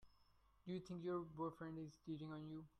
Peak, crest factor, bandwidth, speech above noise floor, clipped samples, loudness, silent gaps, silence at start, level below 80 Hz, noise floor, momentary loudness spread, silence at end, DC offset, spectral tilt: -36 dBFS; 16 dB; 10.5 kHz; 25 dB; under 0.1%; -51 LUFS; none; 0 s; -76 dBFS; -75 dBFS; 6 LU; 0.1 s; under 0.1%; -8 dB/octave